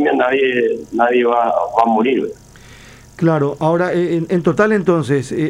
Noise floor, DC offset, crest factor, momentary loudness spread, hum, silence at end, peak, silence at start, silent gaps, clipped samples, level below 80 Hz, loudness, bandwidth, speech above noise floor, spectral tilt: -40 dBFS; under 0.1%; 16 dB; 4 LU; none; 0 s; 0 dBFS; 0 s; none; under 0.1%; -52 dBFS; -16 LUFS; 11.5 kHz; 25 dB; -7 dB/octave